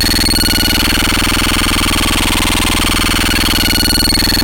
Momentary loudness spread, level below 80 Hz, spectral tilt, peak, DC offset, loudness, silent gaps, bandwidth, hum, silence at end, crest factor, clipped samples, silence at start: 2 LU; -20 dBFS; -2.5 dB/octave; -2 dBFS; under 0.1%; -11 LUFS; none; 17.5 kHz; 60 Hz at -45 dBFS; 0 s; 10 dB; under 0.1%; 0 s